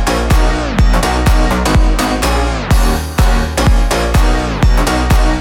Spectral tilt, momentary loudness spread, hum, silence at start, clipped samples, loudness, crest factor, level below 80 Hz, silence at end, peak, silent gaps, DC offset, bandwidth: -5 dB/octave; 2 LU; none; 0 s; under 0.1%; -13 LUFS; 10 dB; -12 dBFS; 0 s; 0 dBFS; none; under 0.1%; 16.5 kHz